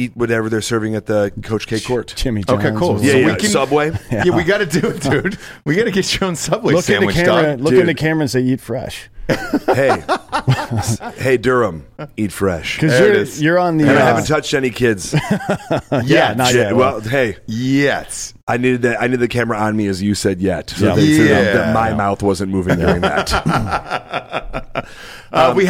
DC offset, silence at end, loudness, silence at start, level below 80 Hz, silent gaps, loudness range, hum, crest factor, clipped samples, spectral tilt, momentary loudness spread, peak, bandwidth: under 0.1%; 0 s; -16 LUFS; 0 s; -38 dBFS; 18.43-18.47 s; 3 LU; none; 12 dB; under 0.1%; -5.5 dB/octave; 10 LU; -2 dBFS; 16.5 kHz